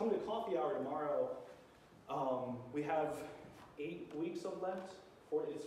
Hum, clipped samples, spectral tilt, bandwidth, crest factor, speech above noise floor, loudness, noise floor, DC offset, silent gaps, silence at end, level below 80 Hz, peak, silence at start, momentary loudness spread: none; under 0.1%; -6.5 dB/octave; 15 kHz; 16 dB; 21 dB; -41 LUFS; -62 dBFS; under 0.1%; none; 0 s; -76 dBFS; -26 dBFS; 0 s; 17 LU